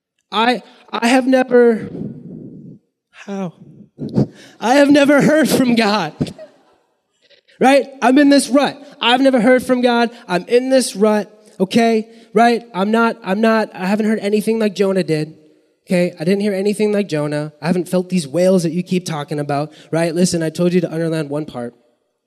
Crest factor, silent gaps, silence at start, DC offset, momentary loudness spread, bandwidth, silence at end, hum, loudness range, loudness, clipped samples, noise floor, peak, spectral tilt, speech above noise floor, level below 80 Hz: 14 dB; none; 0.3 s; under 0.1%; 14 LU; 13.5 kHz; 0.55 s; none; 5 LU; -16 LUFS; under 0.1%; -62 dBFS; -2 dBFS; -5.5 dB/octave; 47 dB; -58 dBFS